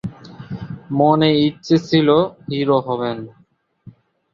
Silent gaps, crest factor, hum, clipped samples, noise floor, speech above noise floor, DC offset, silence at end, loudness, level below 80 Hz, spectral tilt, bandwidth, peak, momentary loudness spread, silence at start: none; 16 dB; none; under 0.1%; -45 dBFS; 29 dB; under 0.1%; 0.45 s; -17 LUFS; -54 dBFS; -7.5 dB/octave; 7.2 kHz; -2 dBFS; 18 LU; 0.05 s